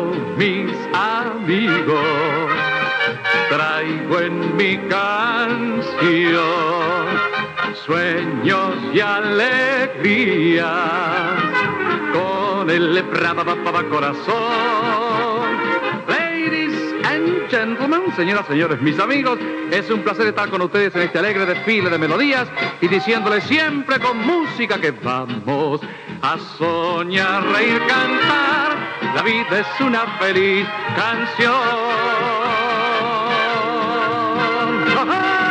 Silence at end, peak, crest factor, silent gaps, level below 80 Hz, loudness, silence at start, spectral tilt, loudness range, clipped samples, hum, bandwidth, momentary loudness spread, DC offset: 0 s; -2 dBFS; 16 dB; none; -64 dBFS; -18 LUFS; 0 s; -5.5 dB/octave; 2 LU; under 0.1%; none; 9.4 kHz; 5 LU; under 0.1%